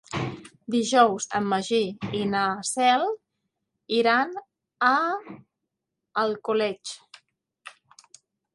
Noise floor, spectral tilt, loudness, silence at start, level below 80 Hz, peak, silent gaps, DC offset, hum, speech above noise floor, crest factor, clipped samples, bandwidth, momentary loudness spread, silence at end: -83 dBFS; -3.5 dB/octave; -24 LUFS; 0.1 s; -66 dBFS; -6 dBFS; none; under 0.1%; none; 59 dB; 22 dB; under 0.1%; 11.5 kHz; 16 LU; 0.85 s